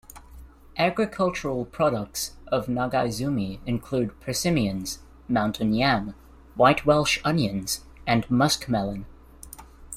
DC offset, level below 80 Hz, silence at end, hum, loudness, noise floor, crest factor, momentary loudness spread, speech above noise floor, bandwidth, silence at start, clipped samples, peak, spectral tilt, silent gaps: under 0.1%; -46 dBFS; 0 s; none; -25 LUFS; -46 dBFS; 20 dB; 14 LU; 22 dB; 16 kHz; 0.1 s; under 0.1%; -6 dBFS; -5 dB/octave; none